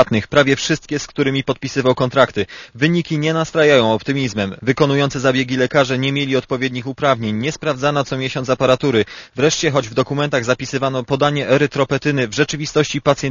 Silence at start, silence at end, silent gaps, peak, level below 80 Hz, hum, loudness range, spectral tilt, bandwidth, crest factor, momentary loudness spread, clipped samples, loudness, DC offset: 0 s; 0 s; none; 0 dBFS; -48 dBFS; none; 2 LU; -5 dB/octave; 7.4 kHz; 16 dB; 6 LU; under 0.1%; -17 LUFS; under 0.1%